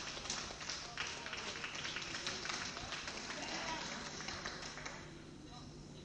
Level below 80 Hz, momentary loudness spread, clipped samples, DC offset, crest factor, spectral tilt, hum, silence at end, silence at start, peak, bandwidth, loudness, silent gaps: -62 dBFS; 12 LU; under 0.1%; under 0.1%; 22 dB; -2 dB/octave; none; 0 s; 0 s; -22 dBFS; 10.5 kHz; -43 LUFS; none